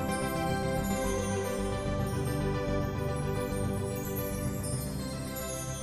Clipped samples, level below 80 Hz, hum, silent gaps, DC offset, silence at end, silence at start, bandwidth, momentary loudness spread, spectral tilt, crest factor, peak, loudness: under 0.1%; -42 dBFS; none; none; 0.1%; 0 s; 0 s; 14.5 kHz; 4 LU; -5.5 dB/octave; 14 dB; -18 dBFS; -33 LUFS